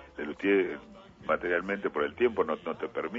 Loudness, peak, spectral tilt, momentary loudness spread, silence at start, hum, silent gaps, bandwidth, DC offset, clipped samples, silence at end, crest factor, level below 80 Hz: -30 LUFS; -14 dBFS; -7 dB/octave; 10 LU; 0 s; none; none; 7.2 kHz; under 0.1%; under 0.1%; 0 s; 16 dB; -62 dBFS